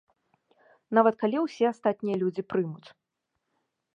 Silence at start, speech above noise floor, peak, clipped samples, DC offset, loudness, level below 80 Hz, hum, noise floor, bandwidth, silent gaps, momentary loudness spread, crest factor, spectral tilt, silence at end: 0.9 s; 55 dB; -6 dBFS; under 0.1%; under 0.1%; -27 LUFS; -76 dBFS; none; -82 dBFS; 7.8 kHz; none; 8 LU; 22 dB; -7.5 dB/octave; 1.1 s